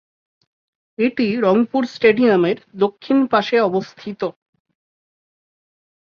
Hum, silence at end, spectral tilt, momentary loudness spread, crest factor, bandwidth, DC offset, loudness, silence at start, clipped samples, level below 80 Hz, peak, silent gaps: none; 1.8 s; -7 dB/octave; 12 LU; 18 dB; 7 kHz; under 0.1%; -18 LUFS; 1 s; under 0.1%; -64 dBFS; 0 dBFS; none